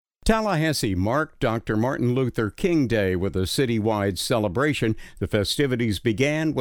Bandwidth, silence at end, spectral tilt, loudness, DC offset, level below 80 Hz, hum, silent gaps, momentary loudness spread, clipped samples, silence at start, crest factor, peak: 20 kHz; 0 s; -5.5 dB/octave; -23 LUFS; under 0.1%; -40 dBFS; none; none; 3 LU; under 0.1%; 0.25 s; 18 dB; -6 dBFS